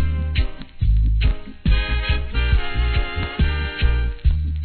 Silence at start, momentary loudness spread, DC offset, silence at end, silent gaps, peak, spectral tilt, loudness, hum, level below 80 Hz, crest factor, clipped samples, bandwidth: 0 s; 4 LU; under 0.1%; 0 s; none; -4 dBFS; -9.5 dB/octave; -22 LUFS; none; -20 dBFS; 14 dB; under 0.1%; 4.5 kHz